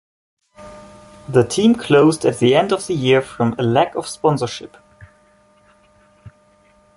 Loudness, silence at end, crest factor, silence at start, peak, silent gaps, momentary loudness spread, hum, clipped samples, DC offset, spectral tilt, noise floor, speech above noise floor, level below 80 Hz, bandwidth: -17 LUFS; 0.7 s; 18 dB; 0.6 s; 0 dBFS; none; 10 LU; none; under 0.1%; under 0.1%; -5.5 dB/octave; -54 dBFS; 38 dB; -54 dBFS; 11.5 kHz